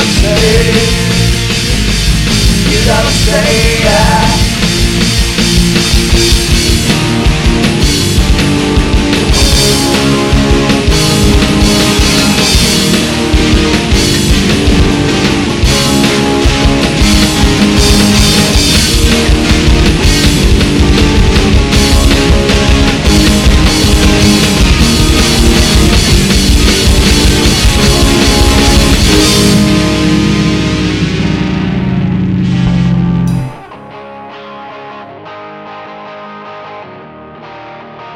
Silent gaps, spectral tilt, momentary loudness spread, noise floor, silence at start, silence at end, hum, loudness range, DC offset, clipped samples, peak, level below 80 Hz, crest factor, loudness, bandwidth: none; -4.5 dB/octave; 19 LU; -30 dBFS; 0 s; 0 s; none; 6 LU; under 0.1%; 0.3%; 0 dBFS; -14 dBFS; 8 dB; -8 LUFS; 17 kHz